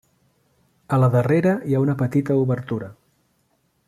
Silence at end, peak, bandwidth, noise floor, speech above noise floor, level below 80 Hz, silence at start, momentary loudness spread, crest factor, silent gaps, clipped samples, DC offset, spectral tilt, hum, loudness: 0.95 s; -6 dBFS; 13 kHz; -67 dBFS; 47 dB; -58 dBFS; 0.9 s; 11 LU; 16 dB; none; under 0.1%; under 0.1%; -9.5 dB/octave; none; -21 LUFS